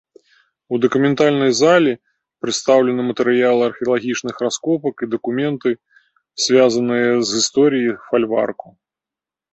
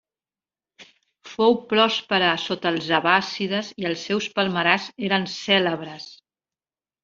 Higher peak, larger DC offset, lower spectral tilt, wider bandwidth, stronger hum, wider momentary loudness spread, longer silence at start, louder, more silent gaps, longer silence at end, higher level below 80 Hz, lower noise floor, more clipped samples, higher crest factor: about the same, -2 dBFS vs -2 dBFS; neither; about the same, -4 dB/octave vs -4.5 dB/octave; about the same, 8.2 kHz vs 7.6 kHz; neither; about the same, 10 LU vs 9 LU; about the same, 0.7 s vs 0.8 s; first, -17 LUFS vs -22 LUFS; neither; about the same, 0.85 s vs 0.9 s; about the same, -62 dBFS vs -66 dBFS; about the same, -88 dBFS vs under -90 dBFS; neither; second, 16 dB vs 22 dB